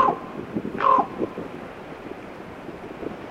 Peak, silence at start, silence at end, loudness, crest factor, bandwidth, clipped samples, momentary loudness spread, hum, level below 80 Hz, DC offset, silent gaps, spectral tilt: -6 dBFS; 0 s; 0 s; -25 LUFS; 20 dB; 11.5 kHz; under 0.1%; 18 LU; none; -56 dBFS; under 0.1%; none; -7 dB/octave